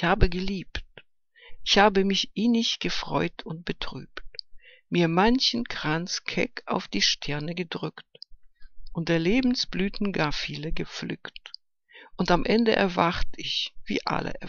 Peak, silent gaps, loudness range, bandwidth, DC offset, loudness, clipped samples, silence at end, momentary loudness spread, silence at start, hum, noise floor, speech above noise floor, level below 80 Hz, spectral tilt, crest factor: -4 dBFS; none; 3 LU; 7.2 kHz; under 0.1%; -26 LUFS; under 0.1%; 0 s; 17 LU; 0 s; none; -56 dBFS; 30 dB; -38 dBFS; -4.5 dB/octave; 24 dB